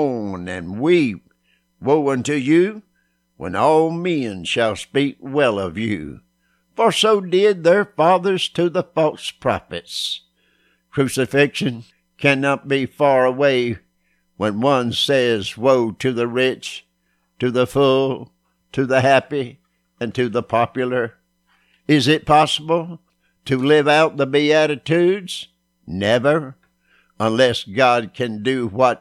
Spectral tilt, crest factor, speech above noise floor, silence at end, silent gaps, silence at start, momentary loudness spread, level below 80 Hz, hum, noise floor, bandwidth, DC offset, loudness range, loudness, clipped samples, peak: -5 dB/octave; 18 dB; 49 dB; 0.05 s; none; 0 s; 13 LU; -56 dBFS; none; -67 dBFS; 14.5 kHz; under 0.1%; 3 LU; -18 LUFS; under 0.1%; -2 dBFS